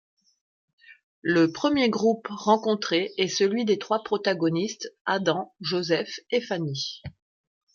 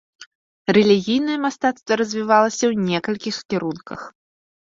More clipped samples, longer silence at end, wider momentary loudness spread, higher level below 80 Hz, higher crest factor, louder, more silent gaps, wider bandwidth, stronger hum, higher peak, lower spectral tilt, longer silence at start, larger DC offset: neither; about the same, 0.65 s vs 0.6 s; second, 9 LU vs 14 LU; second, -66 dBFS vs -60 dBFS; about the same, 20 dB vs 18 dB; second, -25 LUFS vs -20 LUFS; second, 1.03-1.22 s, 5.01-5.05 s vs 0.27-0.65 s; about the same, 7.2 kHz vs 7.8 kHz; neither; second, -8 dBFS vs -2 dBFS; about the same, -4.5 dB/octave vs -5 dB/octave; first, 0.9 s vs 0.2 s; neither